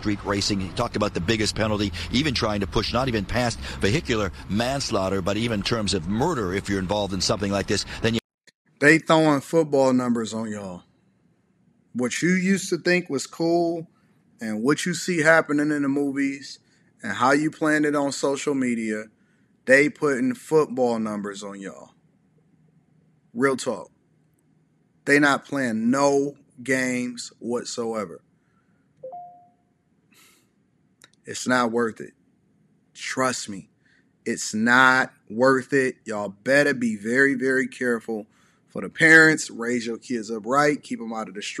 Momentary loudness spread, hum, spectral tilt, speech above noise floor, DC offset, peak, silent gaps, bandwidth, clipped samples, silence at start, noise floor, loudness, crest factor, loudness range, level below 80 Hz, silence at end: 16 LU; none; -4.5 dB/octave; 43 dB; under 0.1%; -4 dBFS; 8.24-8.38 s, 8.55-8.65 s; 13 kHz; under 0.1%; 0 s; -65 dBFS; -22 LUFS; 20 dB; 9 LU; -48 dBFS; 0 s